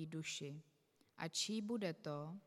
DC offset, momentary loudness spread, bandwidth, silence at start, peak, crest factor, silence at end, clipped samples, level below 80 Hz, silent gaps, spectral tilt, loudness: under 0.1%; 10 LU; 16 kHz; 0 s; -28 dBFS; 18 dB; 0.05 s; under 0.1%; under -90 dBFS; none; -4 dB/octave; -44 LUFS